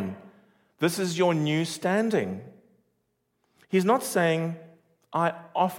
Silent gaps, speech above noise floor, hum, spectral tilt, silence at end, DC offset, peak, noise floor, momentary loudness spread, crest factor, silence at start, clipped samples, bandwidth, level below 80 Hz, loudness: none; 50 dB; none; -5.5 dB/octave; 0 s; under 0.1%; -10 dBFS; -75 dBFS; 12 LU; 18 dB; 0 s; under 0.1%; 17 kHz; -76 dBFS; -26 LUFS